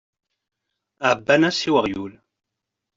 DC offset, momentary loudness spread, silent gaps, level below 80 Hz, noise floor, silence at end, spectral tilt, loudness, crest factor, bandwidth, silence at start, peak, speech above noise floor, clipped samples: under 0.1%; 13 LU; none; -60 dBFS; -83 dBFS; 0.85 s; -4.5 dB/octave; -20 LUFS; 20 dB; 7.8 kHz; 1 s; -4 dBFS; 63 dB; under 0.1%